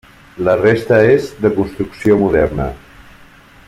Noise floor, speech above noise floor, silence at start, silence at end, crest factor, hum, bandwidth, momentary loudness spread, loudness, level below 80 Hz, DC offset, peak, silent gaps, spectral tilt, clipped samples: -43 dBFS; 29 dB; 0.35 s; 0.9 s; 14 dB; none; 13.5 kHz; 10 LU; -14 LUFS; -36 dBFS; under 0.1%; -2 dBFS; none; -7.5 dB/octave; under 0.1%